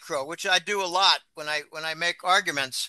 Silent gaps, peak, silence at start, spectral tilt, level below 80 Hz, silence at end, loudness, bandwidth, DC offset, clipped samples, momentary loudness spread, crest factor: none; -6 dBFS; 0 s; -0.5 dB/octave; -78 dBFS; 0 s; -24 LUFS; 12.5 kHz; under 0.1%; under 0.1%; 9 LU; 20 dB